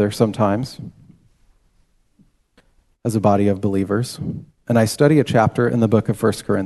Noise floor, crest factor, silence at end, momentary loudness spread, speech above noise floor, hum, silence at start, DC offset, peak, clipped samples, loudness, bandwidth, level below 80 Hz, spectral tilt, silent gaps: -60 dBFS; 18 dB; 0 s; 14 LU; 42 dB; none; 0 s; under 0.1%; -2 dBFS; under 0.1%; -18 LUFS; 12.5 kHz; -46 dBFS; -7 dB/octave; none